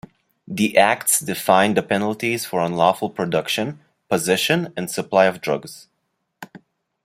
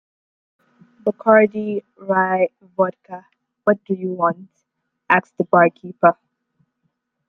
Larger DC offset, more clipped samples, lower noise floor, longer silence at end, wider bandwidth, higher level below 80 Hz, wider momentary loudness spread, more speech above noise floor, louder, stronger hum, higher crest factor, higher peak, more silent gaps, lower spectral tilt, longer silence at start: neither; neither; about the same, -73 dBFS vs -75 dBFS; second, 0.45 s vs 1.15 s; first, 16 kHz vs 4.1 kHz; first, -62 dBFS vs -68 dBFS; second, 10 LU vs 15 LU; about the same, 54 dB vs 57 dB; about the same, -20 LUFS vs -19 LUFS; neither; about the same, 20 dB vs 20 dB; about the same, -2 dBFS vs 0 dBFS; neither; second, -3.5 dB/octave vs -9 dB/octave; second, 0.5 s vs 1.05 s